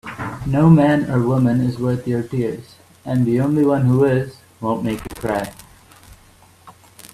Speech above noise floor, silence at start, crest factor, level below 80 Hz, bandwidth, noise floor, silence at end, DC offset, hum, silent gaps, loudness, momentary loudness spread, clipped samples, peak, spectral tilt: 32 dB; 0.05 s; 18 dB; -46 dBFS; 14 kHz; -49 dBFS; 0.05 s; under 0.1%; none; none; -18 LUFS; 14 LU; under 0.1%; 0 dBFS; -8.5 dB/octave